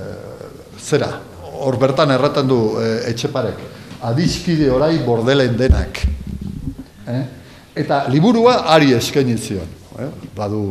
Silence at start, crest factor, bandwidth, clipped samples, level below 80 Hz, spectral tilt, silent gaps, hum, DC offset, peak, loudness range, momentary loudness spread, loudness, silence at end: 0 s; 18 dB; 14 kHz; under 0.1%; -30 dBFS; -6 dB/octave; none; none; 0.1%; 0 dBFS; 2 LU; 19 LU; -17 LUFS; 0 s